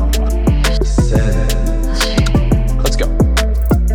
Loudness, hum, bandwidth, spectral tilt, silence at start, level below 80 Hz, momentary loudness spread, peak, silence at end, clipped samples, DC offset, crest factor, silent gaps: -15 LUFS; none; 18 kHz; -5.5 dB/octave; 0 s; -14 dBFS; 3 LU; -2 dBFS; 0 s; under 0.1%; under 0.1%; 10 dB; none